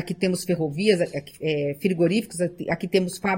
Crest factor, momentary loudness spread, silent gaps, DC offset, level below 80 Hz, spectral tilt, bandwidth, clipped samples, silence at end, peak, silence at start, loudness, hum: 18 dB; 7 LU; none; under 0.1%; -60 dBFS; -5.5 dB/octave; 17 kHz; under 0.1%; 0 s; -6 dBFS; 0 s; -24 LUFS; none